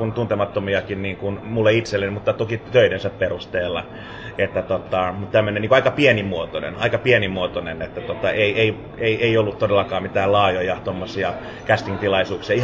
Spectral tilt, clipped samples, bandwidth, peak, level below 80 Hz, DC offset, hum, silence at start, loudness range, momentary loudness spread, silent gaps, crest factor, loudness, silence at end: -6.5 dB/octave; under 0.1%; 8 kHz; -2 dBFS; -44 dBFS; under 0.1%; none; 0 s; 2 LU; 10 LU; none; 18 dB; -20 LUFS; 0 s